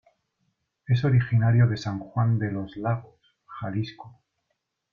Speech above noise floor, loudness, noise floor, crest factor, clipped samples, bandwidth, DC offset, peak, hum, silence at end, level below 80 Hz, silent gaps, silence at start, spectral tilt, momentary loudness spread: 55 dB; -25 LUFS; -79 dBFS; 16 dB; under 0.1%; 6.8 kHz; under 0.1%; -10 dBFS; none; 0.85 s; -56 dBFS; none; 0.9 s; -8.5 dB/octave; 11 LU